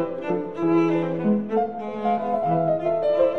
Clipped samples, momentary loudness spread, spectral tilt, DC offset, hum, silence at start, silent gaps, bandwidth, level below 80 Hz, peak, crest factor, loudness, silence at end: under 0.1%; 7 LU; -9 dB/octave; 0.5%; none; 0 s; none; 6.4 kHz; -62 dBFS; -8 dBFS; 14 dB; -23 LUFS; 0 s